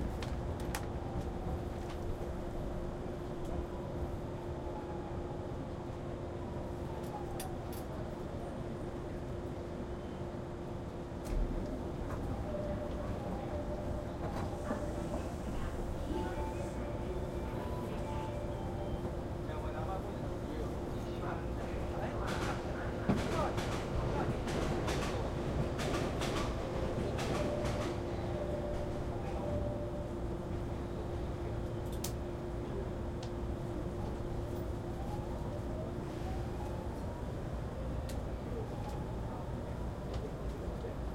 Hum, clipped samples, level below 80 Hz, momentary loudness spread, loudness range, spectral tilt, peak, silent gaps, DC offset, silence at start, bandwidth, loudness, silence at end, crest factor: none; under 0.1%; -44 dBFS; 6 LU; 6 LU; -6.5 dB/octave; -20 dBFS; none; under 0.1%; 0 s; 16 kHz; -40 LUFS; 0 s; 18 dB